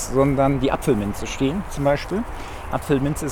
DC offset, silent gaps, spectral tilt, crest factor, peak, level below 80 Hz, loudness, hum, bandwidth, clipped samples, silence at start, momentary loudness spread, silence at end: under 0.1%; none; -6 dB/octave; 16 dB; -6 dBFS; -34 dBFS; -22 LUFS; none; 17.5 kHz; under 0.1%; 0 s; 10 LU; 0 s